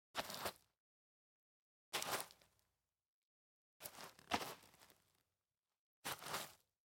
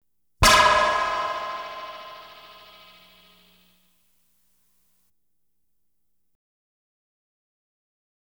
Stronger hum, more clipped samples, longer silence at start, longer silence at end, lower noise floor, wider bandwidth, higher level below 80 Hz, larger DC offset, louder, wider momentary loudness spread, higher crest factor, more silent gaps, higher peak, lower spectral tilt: second, none vs 60 Hz at -75 dBFS; neither; second, 0.15 s vs 0.4 s; second, 0.45 s vs 6.1 s; first, under -90 dBFS vs -79 dBFS; second, 17 kHz vs over 20 kHz; second, -82 dBFS vs -42 dBFS; neither; second, -47 LUFS vs -20 LUFS; second, 15 LU vs 26 LU; first, 30 dB vs 24 dB; first, 0.78-1.92 s, 3.06-3.80 s, 5.57-5.63 s, 5.79-6.02 s vs none; second, -24 dBFS vs -4 dBFS; about the same, -1.5 dB/octave vs -2 dB/octave